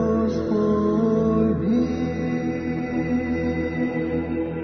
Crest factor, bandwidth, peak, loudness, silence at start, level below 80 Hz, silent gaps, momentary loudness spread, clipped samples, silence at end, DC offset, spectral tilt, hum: 12 dB; 6.4 kHz; -10 dBFS; -23 LUFS; 0 s; -42 dBFS; none; 5 LU; under 0.1%; 0 s; under 0.1%; -8.5 dB/octave; none